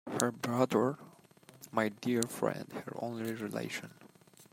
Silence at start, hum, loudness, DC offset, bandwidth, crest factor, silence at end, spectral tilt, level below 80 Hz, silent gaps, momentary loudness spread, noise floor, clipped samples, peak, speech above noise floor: 0.05 s; none; -35 LUFS; under 0.1%; 16 kHz; 28 dB; 0.1 s; -5 dB/octave; -78 dBFS; none; 13 LU; -60 dBFS; under 0.1%; -8 dBFS; 25 dB